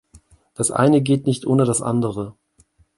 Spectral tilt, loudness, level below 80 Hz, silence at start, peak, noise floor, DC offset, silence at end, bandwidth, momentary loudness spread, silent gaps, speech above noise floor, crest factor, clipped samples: -6 dB/octave; -19 LUFS; -54 dBFS; 0.6 s; -2 dBFS; -58 dBFS; under 0.1%; 0.65 s; 11.5 kHz; 10 LU; none; 40 dB; 18 dB; under 0.1%